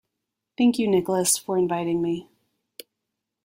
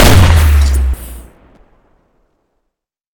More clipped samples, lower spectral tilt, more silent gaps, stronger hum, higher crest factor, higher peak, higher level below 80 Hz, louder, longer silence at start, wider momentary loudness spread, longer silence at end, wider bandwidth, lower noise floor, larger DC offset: second, under 0.1% vs 1%; about the same, -4.5 dB/octave vs -5 dB/octave; neither; neither; about the same, 16 dB vs 12 dB; second, -8 dBFS vs 0 dBFS; second, -64 dBFS vs -14 dBFS; second, -23 LUFS vs -10 LUFS; first, 0.6 s vs 0 s; second, 5 LU vs 17 LU; second, 1.2 s vs 1.95 s; second, 16.5 kHz vs 19 kHz; first, -83 dBFS vs -73 dBFS; neither